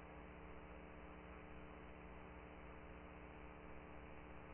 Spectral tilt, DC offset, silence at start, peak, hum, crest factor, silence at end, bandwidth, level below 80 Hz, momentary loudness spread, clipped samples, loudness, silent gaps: -3.5 dB/octave; under 0.1%; 0 s; -42 dBFS; 60 Hz at -60 dBFS; 14 dB; 0 s; 3.1 kHz; -62 dBFS; 0 LU; under 0.1%; -58 LUFS; none